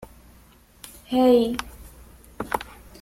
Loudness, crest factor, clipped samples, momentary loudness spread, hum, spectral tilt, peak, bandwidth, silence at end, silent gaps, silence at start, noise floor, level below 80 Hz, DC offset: -22 LUFS; 20 dB; under 0.1%; 25 LU; none; -5 dB/octave; -6 dBFS; 16.5 kHz; 0.4 s; none; 0 s; -53 dBFS; -48 dBFS; under 0.1%